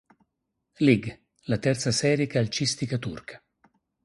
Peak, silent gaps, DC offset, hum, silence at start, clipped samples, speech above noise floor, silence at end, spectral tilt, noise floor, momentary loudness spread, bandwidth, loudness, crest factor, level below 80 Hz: -6 dBFS; none; under 0.1%; none; 0.8 s; under 0.1%; 55 dB; 0.7 s; -5 dB/octave; -80 dBFS; 18 LU; 11.5 kHz; -25 LUFS; 20 dB; -58 dBFS